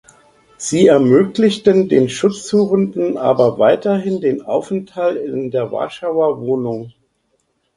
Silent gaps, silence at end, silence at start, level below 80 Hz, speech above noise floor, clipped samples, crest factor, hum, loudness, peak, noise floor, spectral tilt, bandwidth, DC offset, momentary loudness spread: none; 0.85 s; 0.6 s; -56 dBFS; 50 dB; under 0.1%; 16 dB; none; -16 LUFS; 0 dBFS; -65 dBFS; -6 dB/octave; 11 kHz; under 0.1%; 10 LU